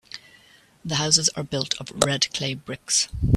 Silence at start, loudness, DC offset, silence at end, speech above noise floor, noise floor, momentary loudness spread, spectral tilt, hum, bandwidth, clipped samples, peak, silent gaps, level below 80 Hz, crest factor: 0.15 s; -22 LUFS; under 0.1%; 0 s; 31 dB; -54 dBFS; 17 LU; -3 dB/octave; none; 15.5 kHz; under 0.1%; 0 dBFS; none; -42 dBFS; 24 dB